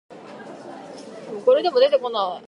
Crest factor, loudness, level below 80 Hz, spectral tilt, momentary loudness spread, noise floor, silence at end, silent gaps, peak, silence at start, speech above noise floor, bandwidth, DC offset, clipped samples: 18 dB; -19 LUFS; -80 dBFS; -4.5 dB/octave; 21 LU; -39 dBFS; 0.1 s; none; -6 dBFS; 0.1 s; 20 dB; 10 kHz; under 0.1%; under 0.1%